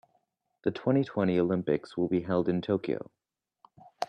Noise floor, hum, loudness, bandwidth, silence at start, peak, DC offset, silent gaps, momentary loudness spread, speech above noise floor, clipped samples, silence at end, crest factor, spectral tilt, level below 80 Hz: -75 dBFS; none; -29 LUFS; 9.6 kHz; 0.65 s; -12 dBFS; under 0.1%; none; 8 LU; 47 dB; under 0.1%; 0.05 s; 18 dB; -8.5 dB/octave; -68 dBFS